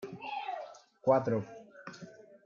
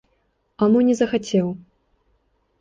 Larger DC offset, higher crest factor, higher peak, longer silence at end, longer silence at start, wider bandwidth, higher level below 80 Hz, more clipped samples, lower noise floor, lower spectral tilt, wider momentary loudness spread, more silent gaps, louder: neither; first, 22 dB vs 16 dB; second, -14 dBFS vs -6 dBFS; second, 0.1 s vs 1.05 s; second, 0 s vs 0.6 s; about the same, 7.2 kHz vs 7.8 kHz; second, -78 dBFS vs -58 dBFS; neither; second, -52 dBFS vs -67 dBFS; about the same, -7 dB/octave vs -6.5 dB/octave; first, 21 LU vs 10 LU; neither; second, -33 LUFS vs -20 LUFS